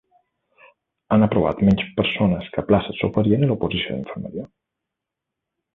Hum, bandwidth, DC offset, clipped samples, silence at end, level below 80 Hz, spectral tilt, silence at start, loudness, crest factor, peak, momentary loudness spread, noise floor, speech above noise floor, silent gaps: none; 4.1 kHz; under 0.1%; under 0.1%; 1.3 s; -44 dBFS; -9 dB/octave; 1.1 s; -21 LUFS; 20 dB; -2 dBFS; 13 LU; -84 dBFS; 64 dB; none